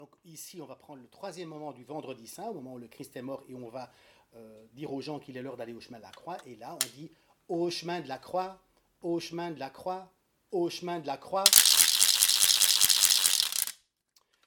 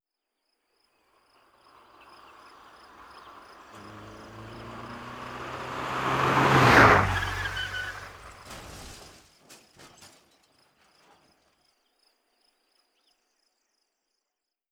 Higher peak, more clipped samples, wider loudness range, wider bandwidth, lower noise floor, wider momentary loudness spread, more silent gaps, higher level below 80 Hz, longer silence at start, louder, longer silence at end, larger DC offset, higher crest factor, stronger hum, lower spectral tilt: first, 0 dBFS vs -4 dBFS; neither; about the same, 22 LU vs 24 LU; about the same, 18 kHz vs 19.5 kHz; second, -71 dBFS vs -86 dBFS; second, 24 LU vs 30 LU; neither; second, -76 dBFS vs -50 dBFS; second, 0 s vs 3.75 s; about the same, -24 LUFS vs -23 LUFS; second, 0.75 s vs 5.2 s; neither; about the same, 30 dB vs 26 dB; neither; second, -0.5 dB/octave vs -5 dB/octave